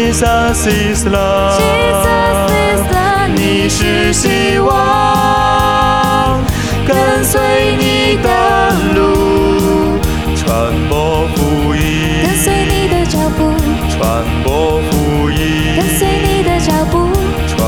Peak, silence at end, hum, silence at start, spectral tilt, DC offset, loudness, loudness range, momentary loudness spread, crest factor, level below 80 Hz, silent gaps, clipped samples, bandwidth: 0 dBFS; 0 s; none; 0 s; -5 dB/octave; 1%; -12 LUFS; 2 LU; 3 LU; 10 dB; -22 dBFS; none; under 0.1%; over 20 kHz